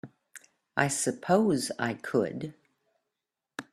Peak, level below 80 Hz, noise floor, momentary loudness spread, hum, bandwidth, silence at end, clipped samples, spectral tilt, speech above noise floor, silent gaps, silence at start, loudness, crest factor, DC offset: -8 dBFS; -70 dBFS; -88 dBFS; 19 LU; none; 15 kHz; 0.1 s; under 0.1%; -4.5 dB/octave; 59 dB; none; 0.05 s; -28 LUFS; 24 dB; under 0.1%